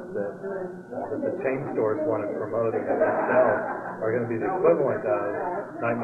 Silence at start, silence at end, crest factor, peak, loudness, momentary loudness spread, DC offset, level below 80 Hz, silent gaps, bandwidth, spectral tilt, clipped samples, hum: 0 s; 0 s; 18 dB; -8 dBFS; -26 LUFS; 11 LU; under 0.1%; -66 dBFS; none; 7.6 kHz; -9.5 dB/octave; under 0.1%; none